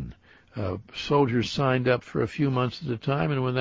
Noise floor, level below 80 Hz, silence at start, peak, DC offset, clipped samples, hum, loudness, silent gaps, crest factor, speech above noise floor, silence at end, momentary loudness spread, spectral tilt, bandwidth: -47 dBFS; -50 dBFS; 0 s; -10 dBFS; under 0.1%; under 0.1%; none; -26 LUFS; none; 16 dB; 22 dB; 0 s; 11 LU; -7 dB/octave; 7.8 kHz